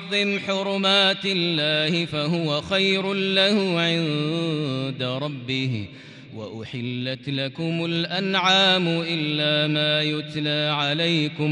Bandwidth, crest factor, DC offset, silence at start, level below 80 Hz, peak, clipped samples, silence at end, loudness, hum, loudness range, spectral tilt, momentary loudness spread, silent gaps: 10.5 kHz; 16 dB; under 0.1%; 0 s; -64 dBFS; -8 dBFS; under 0.1%; 0 s; -22 LUFS; none; 7 LU; -5 dB/octave; 11 LU; none